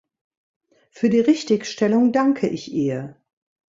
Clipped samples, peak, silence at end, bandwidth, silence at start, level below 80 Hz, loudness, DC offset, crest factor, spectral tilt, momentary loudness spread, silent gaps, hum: under 0.1%; -6 dBFS; 0.55 s; 7.8 kHz; 0.95 s; -64 dBFS; -20 LUFS; under 0.1%; 16 dB; -6 dB/octave; 8 LU; none; none